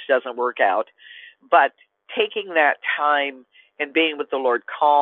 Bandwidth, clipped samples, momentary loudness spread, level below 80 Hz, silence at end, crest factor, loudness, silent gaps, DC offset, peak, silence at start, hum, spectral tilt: 4.2 kHz; under 0.1%; 12 LU; -82 dBFS; 0 s; 18 dB; -21 LUFS; none; under 0.1%; -2 dBFS; 0 s; none; -5.5 dB/octave